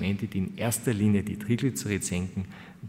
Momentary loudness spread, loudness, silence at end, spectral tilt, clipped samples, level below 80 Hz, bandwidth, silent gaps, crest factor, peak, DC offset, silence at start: 8 LU; -29 LUFS; 0 s; -5.5 dB/octave; under 0.1%; -56 dBFS; 16 kHz; none; 16 dB; -12 dBFS; under 0.1%; 0 s